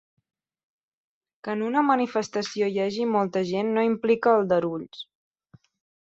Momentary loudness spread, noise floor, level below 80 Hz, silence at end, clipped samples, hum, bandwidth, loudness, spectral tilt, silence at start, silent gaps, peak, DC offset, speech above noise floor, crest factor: 15 LU; -58 dBFS; -70 dBFS; 1.1 s; under 0.1%; none; 7.8 kHz; -24 LUFS; -6 dB/octave; 1.45 s; none; -8 dBFS; under 0.1%; 34 dB; 18 dB